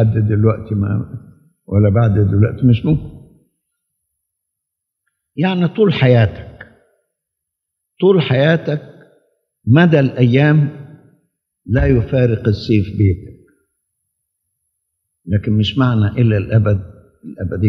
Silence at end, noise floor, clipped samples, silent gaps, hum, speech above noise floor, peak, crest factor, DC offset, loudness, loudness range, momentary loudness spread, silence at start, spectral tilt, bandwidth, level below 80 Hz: 0 s; -79 dBFS; under 0.1%; none; none; 65 dB; 0 dBFS; 16 dB; under 0.1%; -15 LUFS; 6 LU; 13 LU; 0 s; -9.5 dB/octave; 6 kHz; -38 dBFS